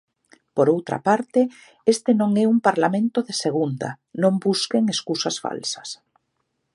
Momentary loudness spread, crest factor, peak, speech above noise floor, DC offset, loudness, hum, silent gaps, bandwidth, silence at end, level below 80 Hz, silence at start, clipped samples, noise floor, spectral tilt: 10 LU; 18 dB; -2 dBFS; 53 dB; under 0.1%; -22 LUFS; none; none; 11.5 kHz; 0.8 s; -72 dBFS; 0.55 s; under 0.1%; -74 dBFS; -5 dB/octave